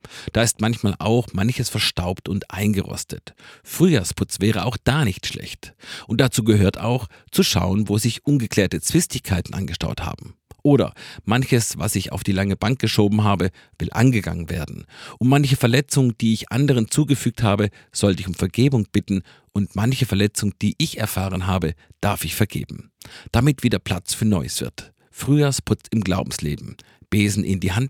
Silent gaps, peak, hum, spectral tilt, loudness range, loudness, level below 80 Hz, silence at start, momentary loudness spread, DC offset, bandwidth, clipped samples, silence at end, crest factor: none; 0 dBFS; none; -5.5 dB/octave; 3 LU; -21 LUFS; -42 dBFS; 0.05 s; 11 LU; under 0.1%; 18.5 kHz; under 0.1%; 0 s; 20 dB